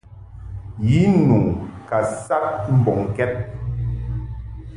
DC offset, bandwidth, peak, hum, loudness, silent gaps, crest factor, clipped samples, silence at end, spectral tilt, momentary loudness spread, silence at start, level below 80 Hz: under 0.1%; 11 kHz; -4 dBFS; none; -20 LUFS; none; 16 dB; under 0.1%; 0 s; -8.5 dB/octave; 18 LU; 0.1 s; -36 dBFS